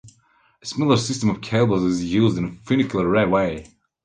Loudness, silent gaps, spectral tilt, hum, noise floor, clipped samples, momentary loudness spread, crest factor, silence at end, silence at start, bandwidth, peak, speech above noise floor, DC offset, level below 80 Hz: -21 LUFS; none; -6 dB/octave; none; -60 dBFS; under 0.1%; 9 LU; 18 dB; 0.4 s; 0.05 s; 9.8 kHz; -4 dBFS; 40 dB; under 0.1%; -48 dBFS